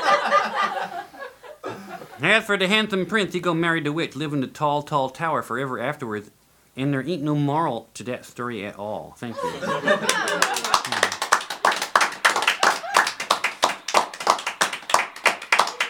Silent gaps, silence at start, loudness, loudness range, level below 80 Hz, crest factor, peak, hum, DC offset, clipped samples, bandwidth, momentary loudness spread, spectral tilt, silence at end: none; 0 s; -22 LUFS; 6 LU; -64 dBFS; 22 dB; -2 dBFS; none; under 0.1%; under 0.1%; 19 kHz; 14 LU; -3 dB/octave; 0 s